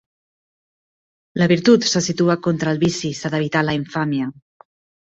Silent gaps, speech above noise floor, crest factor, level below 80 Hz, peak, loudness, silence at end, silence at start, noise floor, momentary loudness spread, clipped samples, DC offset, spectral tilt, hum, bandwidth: none; over 72 dB; 18 dB; -56 dBFS; -2 dBFS; -19 LUFS; 0.7 s; 1.35 s; under -90 dBFS; 10 LU; under 0.1%; under 0.1%; -5 dB/octave; none; 8 kHz